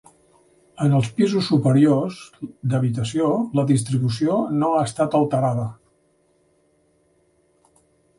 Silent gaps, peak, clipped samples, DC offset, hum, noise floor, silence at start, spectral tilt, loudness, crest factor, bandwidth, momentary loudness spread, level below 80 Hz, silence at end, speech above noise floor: none; -6 dBFS; under 0.1%; under 0.1%; none; -63 dBFS; 0.8 s; -7 dB/octave; -20 LUFS; 16 dB; 11.5 kHz; 10 LU; -58 dBFS; 2.45 s; 43 dB